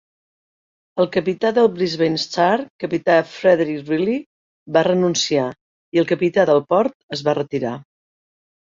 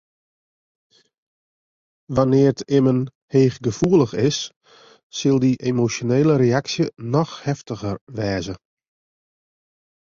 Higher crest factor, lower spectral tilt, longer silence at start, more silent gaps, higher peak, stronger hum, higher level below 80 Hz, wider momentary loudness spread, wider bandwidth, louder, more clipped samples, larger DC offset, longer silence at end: about the same, 18 dB vs 18 dB; second, -5 dB/octave vs -6.5 dB/octave; second, 0.95 s vs 2.1 s; first, 2.70-2.79 s, 4.26-4.66 s, 5.61-5.92 s, 6.94-7.09 s vs 3.15-3.28 s, 4.56-4.61 s, 5.03-5.10 s, 8.01-8.07 s; about the same, -2 dBFS vs -4 dBFS; neither; second, -62 dBFS vs -52 dBFS; second, 8 LU vs 11 LU; about the same, 7.6 kHz vs 7.6 kHz; about the same, -19 LUFS vs -20 LUFS; neither; neither; second, 0.8 s vs 1.55 s